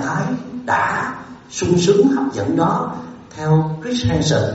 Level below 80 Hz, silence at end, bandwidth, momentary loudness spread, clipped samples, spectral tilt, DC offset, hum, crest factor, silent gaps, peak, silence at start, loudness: -44 dBFS; 0 s; 8 kHz; 12 LU; under 0.1%; -5.5 dB/octave; under 0.1%; none; 16 dB; none; -2 dBFS; 0 s; -18 LUFS